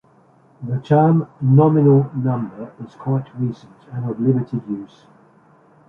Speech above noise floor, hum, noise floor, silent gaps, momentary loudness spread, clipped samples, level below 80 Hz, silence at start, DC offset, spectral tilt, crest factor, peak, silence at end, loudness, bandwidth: 35 dB; none; -53 dBFS; none; 19 LU; under 0.1%; -60 dBFS; 0.6 s; under 0.1%; -11.5 dB/octave; 16 dB; -2 dBFS; 1 s; -18 LUFS; 4 kHz